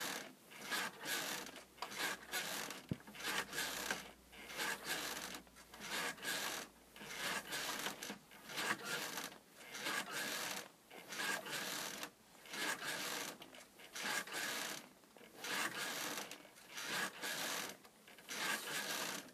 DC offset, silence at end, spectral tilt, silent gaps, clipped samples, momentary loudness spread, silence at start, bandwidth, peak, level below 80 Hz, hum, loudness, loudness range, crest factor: under 0.1%; 0 s; -1 dB/octave; none; under 0.1%; 14 LU; 0 s; 15.5 kHz; -24 dBFS; -78 dBFS; none; -43 LUFS; 1 LU; 22 dB